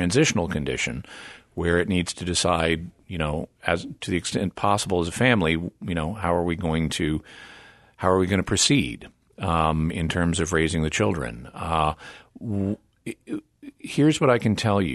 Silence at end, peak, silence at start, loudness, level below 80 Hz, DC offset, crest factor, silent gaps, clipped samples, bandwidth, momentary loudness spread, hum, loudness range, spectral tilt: 0 s; -4 dBFS; 0 s; -24 LUFS; -42 dBFS; under 0.1%; 20 dB; none; under 0.1%; 12.5 kHz; 15 LU; none; 3 LU; -4.5 dB/octave